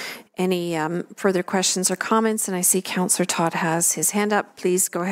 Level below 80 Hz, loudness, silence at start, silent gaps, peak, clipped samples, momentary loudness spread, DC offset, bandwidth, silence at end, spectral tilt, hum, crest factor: -74 dBFS; -21 LUFS; 0 s; none; -4 dBFS; under 0.1%; 6 LU; under 0.1%; 16 kHz; 0 s; -3 dB/octave; none; 18 dB